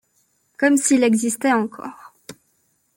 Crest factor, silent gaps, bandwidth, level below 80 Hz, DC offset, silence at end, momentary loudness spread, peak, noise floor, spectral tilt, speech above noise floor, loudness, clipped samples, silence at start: 18 dB; none; 17 kHz; -68 dBFS; under 0.1%; 0.65 s; 16 LU; -2 dBFS; -66 dBFS; -3.5 dB/octave; 48 dB; -18 LUFS; under 0.1%; 0.6 s